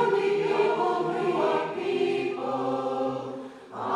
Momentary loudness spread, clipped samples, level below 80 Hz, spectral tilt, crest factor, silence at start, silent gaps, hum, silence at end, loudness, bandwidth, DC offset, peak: 11 LU; under 0.1%; -74 dBFS; -6 dB/octave; 16 dB; 0 s; none; none; 0 s; -27 LUFS; 10.5 kHz; under 0.1%; -12 dBFS